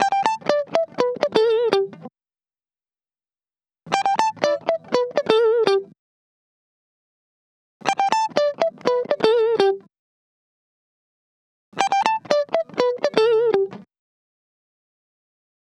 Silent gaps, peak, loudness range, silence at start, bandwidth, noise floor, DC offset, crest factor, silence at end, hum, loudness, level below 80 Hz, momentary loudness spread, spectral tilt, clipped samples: 5.99-7.80 s, 9.99-11.72 s; -2 dBFS; 3 LU; 0 s; 10.5 kHz; under -90 dBFS; under 0.1%; 22 dB; 1.9 s; none; -20 LUFS; -76 dBFS; 6 LU; -3.5 dB/octave; under 0.1%